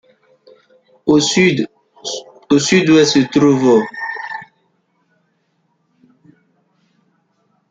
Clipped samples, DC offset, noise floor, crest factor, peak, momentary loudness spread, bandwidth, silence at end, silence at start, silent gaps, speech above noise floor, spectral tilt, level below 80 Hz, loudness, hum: under 0.1%; under 0.1%; -64 dBFS; 16 dB; -2 dBFS; 16 LU; 9.2 kHz; 3.25 s; 1.05 s; none; 52 dB; -4.5 dB/octave; -56 dBFS; -14 LUFS; none